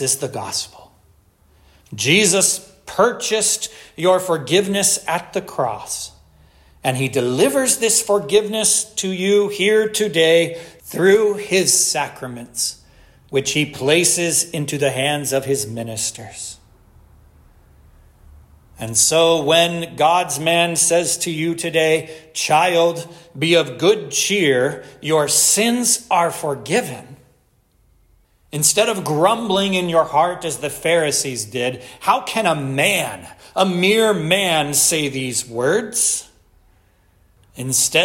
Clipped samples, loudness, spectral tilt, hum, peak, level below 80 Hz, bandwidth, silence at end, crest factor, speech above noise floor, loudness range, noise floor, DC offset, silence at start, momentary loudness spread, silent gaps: under 0.1%; -17 LUFS; -2.5 dB/octave; none; -2 dBFS; -54 dBFS; 16.5 kHz; 0 s; 18 dB; 41 dB; 4 LU; -59 dBFS; under 0.1%; 0 s; 11 LU; none